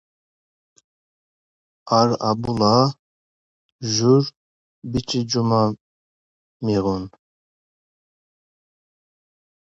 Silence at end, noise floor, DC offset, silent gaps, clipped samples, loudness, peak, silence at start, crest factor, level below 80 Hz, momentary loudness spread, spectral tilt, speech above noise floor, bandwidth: 2.65 s; under -90 dBFS; under 0.1%; 2.99-3.79 s, 4.37-4.82 s, 5.80-6.60 s; under 0.1%; -20 LUFS; -2 dBFS; 1.85 s; 22 dB; -52 dBFS; 13 LU; -6 dB/octave; over 71 dB; 8 kHz